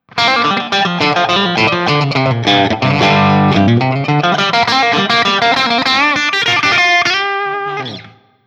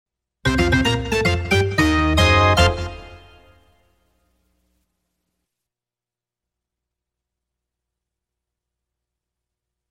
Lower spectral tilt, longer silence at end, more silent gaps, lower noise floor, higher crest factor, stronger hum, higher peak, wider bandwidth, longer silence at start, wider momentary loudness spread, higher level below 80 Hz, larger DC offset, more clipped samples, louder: about the same, -4.5 dB/octave vs -5 dB/octave; second, 0.4 s vs 6.75 s; neither; second, -37 dBFS vs -90 dBFS; second, 12 dB vs 20 dB; second, none vs 60 Hz at -60 dBFS; about the same, 0 dBFS vs -2 dBFS; second, 13 kHz vs 16 kHz; second, 0.15 s vs 0.45 s; second, 5 LU vs 12 LU; second, -52 dBFS vs -34 dBFS; neither; neither; first, -11 LUFS vs -17 LUFS